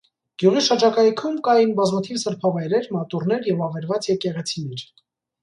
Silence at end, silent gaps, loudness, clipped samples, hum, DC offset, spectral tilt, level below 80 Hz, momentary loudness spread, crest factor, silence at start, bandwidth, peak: 0.6 s; none; -21 LUFS; under 0.1%; none; under 0.1%; -5.5 dB/octave; -68 dBFS; 10 LU; 18 dB; 0.4 s; 11 kHz; -4 dBFS